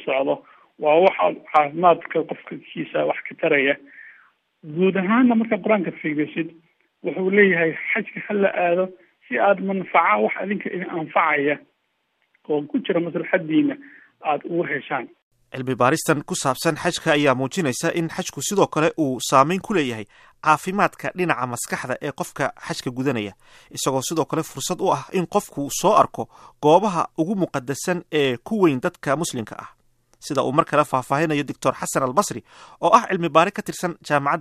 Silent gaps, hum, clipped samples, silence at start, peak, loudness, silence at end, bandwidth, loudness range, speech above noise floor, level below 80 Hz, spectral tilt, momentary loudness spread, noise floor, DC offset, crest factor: 15.22-15.31 s; none; under 0.1%; 0 s; 0 dBFS; -21 LUFS; 0 s; 15 kHz; 4 LU; 50 dB; -62 dBFS; -4.5 dB/octave; 11 LU; -71 dBFS; under 0.1%; 20 dB